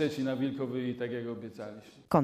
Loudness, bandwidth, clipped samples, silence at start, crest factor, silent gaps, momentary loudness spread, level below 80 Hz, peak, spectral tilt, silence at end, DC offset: -34 LUFS; 14.5 kHz; under 0.1%; 0 s; 20 dB; none; 13 LU; -66 dBFS; -12 dBFS; -7.5 dB/octave; 0 s; under 0.1%